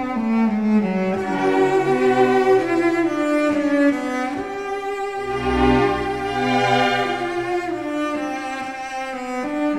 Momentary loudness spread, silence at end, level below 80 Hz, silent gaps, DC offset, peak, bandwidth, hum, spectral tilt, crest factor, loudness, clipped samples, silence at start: 10 LU; 0 s; -42 dBFS; none; 0.3%; -4 dBFS; 13 kHz; none; -6 dB/octave; 16 dB; -20 LUFS; under 0.1%; 0 s